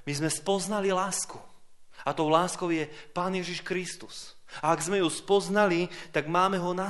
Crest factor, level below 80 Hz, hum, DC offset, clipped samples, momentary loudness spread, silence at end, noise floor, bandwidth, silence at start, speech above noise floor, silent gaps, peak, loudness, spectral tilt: 20 dB; -64 dBFS; none; under 0.1%; under 0.1%; 12 LU; 0 s; -49 dBFS; 11.5 kHz; 0 s; 21 dB; none; -8 dBFS; -28 LUFS; -4 dB/octave